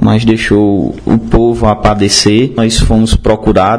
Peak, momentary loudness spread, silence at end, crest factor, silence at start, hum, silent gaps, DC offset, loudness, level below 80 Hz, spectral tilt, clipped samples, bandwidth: 0 dBFS; 4 LU; 0 s; 8 dB; 0 s; none; none; 0.9%; -9 LUFS; -20 dBFS; -5 dB/octave; 1%; 11 kHz